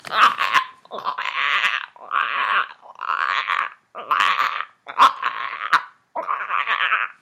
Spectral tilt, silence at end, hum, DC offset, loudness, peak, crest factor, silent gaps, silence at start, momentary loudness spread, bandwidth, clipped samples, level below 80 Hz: 0 dB/octave; 0.1 s; none; under 0.1%; -21 LUFS; -2 dBFS; 20 dB; none; 0.05 s; 13 LU; 16 kHz; under 0.1%; -82 dBFS